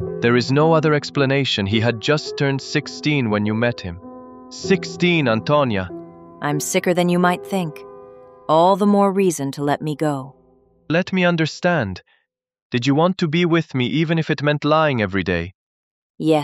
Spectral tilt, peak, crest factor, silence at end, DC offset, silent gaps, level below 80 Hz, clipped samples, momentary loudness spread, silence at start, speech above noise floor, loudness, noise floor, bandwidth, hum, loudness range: -5.5 dB/octave; -2 dBFS; 18 dB; 0 s; under 0.1%; 12.62-12.70 s, 15.55-16.14 s; -54 dBFS; under 0.1%; 13 LU; 0 s; 37 dB; -19 LUFS; -55 dBFS; 15.5 kHz; none; 3 LU